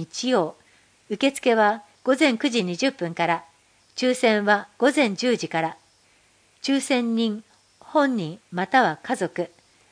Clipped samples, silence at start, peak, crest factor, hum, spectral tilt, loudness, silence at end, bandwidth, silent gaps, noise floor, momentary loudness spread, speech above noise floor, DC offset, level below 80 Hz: under 0.1%; 0 s; -4 dBFS; 20 dB; none; -4 dB/octave; -23 LUFS; 0.45 s; 10.5 kHz; none; -60 dBFS; 11 LU; 38 dB; under 0.1%; -74 dBFS